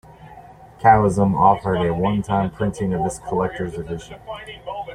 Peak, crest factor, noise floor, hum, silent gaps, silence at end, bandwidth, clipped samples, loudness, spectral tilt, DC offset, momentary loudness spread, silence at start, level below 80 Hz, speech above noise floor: -2 dBFS; 18 dB; -43 dBFS; none; none; 0 s; 11 kHz; under 0.1%; -19 LUFS; -7 dB/octave; under 0.1%; 17 LU; 0.2 s; -44 dBFS; 23 dB